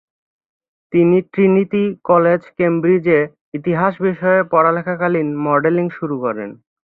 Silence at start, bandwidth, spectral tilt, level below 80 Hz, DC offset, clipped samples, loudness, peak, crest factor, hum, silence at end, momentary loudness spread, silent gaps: 0.9 s; 4.1 kHz; -11 dB/octave; -60 dBFS; under 0.1%; under 0.1%; -16 LUFS; -2 dBFS; 14 dB; none; 0.3 s; 8 LU; 3.41-3.52 s